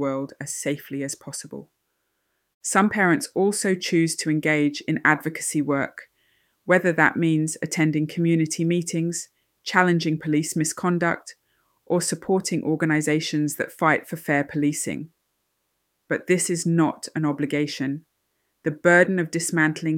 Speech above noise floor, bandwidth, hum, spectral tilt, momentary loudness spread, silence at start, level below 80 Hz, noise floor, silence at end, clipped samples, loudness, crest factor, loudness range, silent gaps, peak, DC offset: 52 dB; 17 kHz; none; -5 dB/octave; 11 LU; 0 s; -68 dBFS; -74 dBFS; 0 s; under 0.1%; -23 LUFS; 22 dB; 3 LU; 2.54-2.61 s; -2 dBFS; under 0.1%